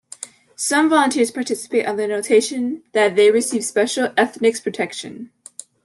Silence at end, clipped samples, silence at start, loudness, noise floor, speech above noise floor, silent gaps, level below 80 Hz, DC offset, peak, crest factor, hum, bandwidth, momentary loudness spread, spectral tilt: 0.6 s; under 0.1%; 0.2 s; -18 LUFS; -39 dBFS; 21 dB; none; -70 dBFS; under 0.1%; -4 dBFS; 16 dB; none; 12.5 kHz; 20 LU; -3 dB/octave